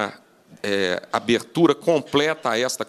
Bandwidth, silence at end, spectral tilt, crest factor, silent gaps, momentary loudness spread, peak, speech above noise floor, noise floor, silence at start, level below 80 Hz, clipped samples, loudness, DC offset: 14 kHz; 0.05 s; -4 dB/octave; 18 dB; none; 7 LU; -4 dBFS; 28 dB; -49 dBFS; 0 s; -64 dBFS; under 0.1%; -22 LUFS; under 0.1%